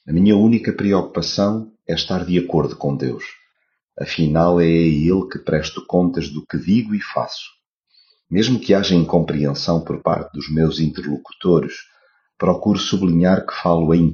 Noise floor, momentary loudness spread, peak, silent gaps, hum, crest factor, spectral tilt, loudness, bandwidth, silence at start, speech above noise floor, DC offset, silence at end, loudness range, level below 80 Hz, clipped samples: -69 dBFS; 11 LU; -2 dBFS; 3.84-3.88 s, 7.72-7.79 s; none; 16 dB; -6 dB/octave; -18 LUFS; 7 kHz; 0.05 s; 51 dB; under 0.1%; 0 s; 3 LU; -42 dBFS; under 0.1%